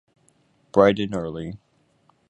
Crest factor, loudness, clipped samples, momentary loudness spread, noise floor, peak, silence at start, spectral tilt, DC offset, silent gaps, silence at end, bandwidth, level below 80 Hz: 24 dB; -21 LUFS; under 0.1%; 18 LU; -63 dBFS; -2 dBFS; 0.75 s; -7 dB/octave; under 0.1%; none; 0.75 s; 10 kHz; -54 dBFS